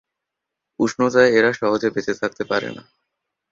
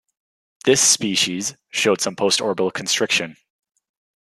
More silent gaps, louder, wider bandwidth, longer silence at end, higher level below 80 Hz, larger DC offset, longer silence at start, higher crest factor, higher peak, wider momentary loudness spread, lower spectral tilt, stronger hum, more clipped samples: neither; about the same, -19 LUFS vs -18 LUFS; second, 7.6 kHz vs 13.5 kHz; second, 0.7 s vs 0.9 s; first, -60 dBFS vs -68 dBFS; neither; first, 0.8 s vs 0.65 s; about the same, 18 dB vs 20 dB; about the same, -2 dBFS vs -2 dBFS; about the same, 10 LU vs 10 LU; first, -5 dB/octave vs -1.5 dB/octave; neither; neither